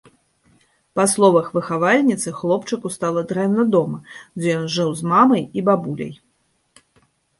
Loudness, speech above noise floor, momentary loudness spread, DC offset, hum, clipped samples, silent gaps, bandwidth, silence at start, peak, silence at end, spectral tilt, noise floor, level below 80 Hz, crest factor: -19 LUFS; 47 dB; 13 LU; under 0.1%; none; under 0.1%; none; 12 kHz; 0.95 s; -2 dBFS; 1.25 s; -5 dB/octave; -66 dBFS; -62 dBFS; 18 dB